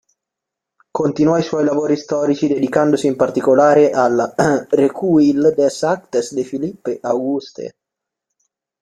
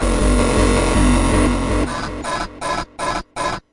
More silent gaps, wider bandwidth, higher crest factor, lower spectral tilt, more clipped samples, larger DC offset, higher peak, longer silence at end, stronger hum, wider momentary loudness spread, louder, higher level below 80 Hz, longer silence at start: neither; about the same, 11 kHz vs 11.5 kHz; about the same, 16 dB vs 12 dB; about the same, -6 dB/octave vs -5 dB/octave; neither; neither; about the same, -2 dBFS vs -4 dBFS; first, 1.15 s vs 0.15 s; neither; about the same, 11 LU vs 9 LU; about the same, -16 LUFS vs -18 LUFS; second, -58 dBFS vs -22 dBFS; first, 0.95 s vs 0 s